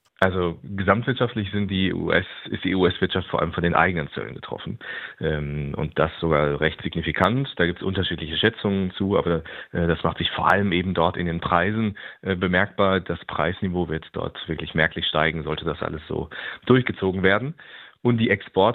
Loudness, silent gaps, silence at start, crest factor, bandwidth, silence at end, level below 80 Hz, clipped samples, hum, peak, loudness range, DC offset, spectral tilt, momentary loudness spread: -23 LUFS; none; 0.2 s; 22 dB; 5.4 kHz; 0 s; -48 dBFS; under 0.1%; none; -2 dBFS; 3 LU; under 0.1%; -8 dB/octave; 10 LU